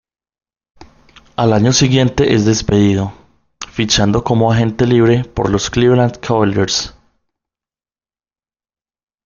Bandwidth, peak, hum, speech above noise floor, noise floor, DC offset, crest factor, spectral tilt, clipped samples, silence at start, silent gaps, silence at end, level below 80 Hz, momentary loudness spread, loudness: 7.4 kHz; 0 dBFS; none; over 77 dB; under -90 dBFS; under 0.1%; 16 dB; -5 dB/octave; under 0.1%; 0.8 s; none; 2.35 s; -38 dBFS; 9 LU; -13 LUFS